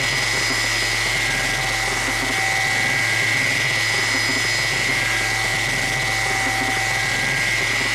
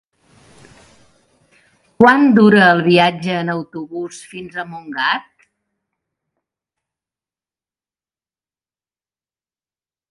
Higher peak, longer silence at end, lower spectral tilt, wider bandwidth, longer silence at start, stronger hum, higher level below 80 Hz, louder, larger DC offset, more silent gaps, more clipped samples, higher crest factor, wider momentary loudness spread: second, -8 dBFS vs 0 dBFS; second, 0 s vs 4.9 s; second, -1.5 dB/octave vs -6 dB/octave; first, 17 kHz vs 11.5 kHz; second, 0 s vs 2 s; neither; first, -40 dBFS vs -58 dBFS; second, -18 LUFS vs -13 LUFS; neither; neither; neither; second, 12 dB vs 18 dB; second, 2 LU vs 18 LU